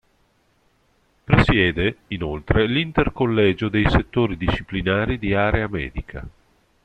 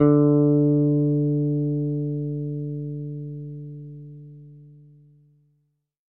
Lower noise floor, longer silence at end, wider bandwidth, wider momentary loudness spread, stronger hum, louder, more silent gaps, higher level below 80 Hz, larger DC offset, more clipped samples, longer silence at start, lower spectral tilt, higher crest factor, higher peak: second, -63 dBFS vs -70 dBFS; second, 0.55 s vs 1.45 s; first, 8.8 kHz vs 2.2 kHz; second, 11 LU vs 22 LU; neither; about the same, -21 LUFS vs -22 LUFS; neither; first, -32 dBFS vs -54 dBFS; neither; neither; first, 1.3 s vs 0 s; second, -8 dB/octave vs -14.5 dB/octave; about the same, 20 dB vs 18 dB; about the same, -2 dBFS vs -4 dBFS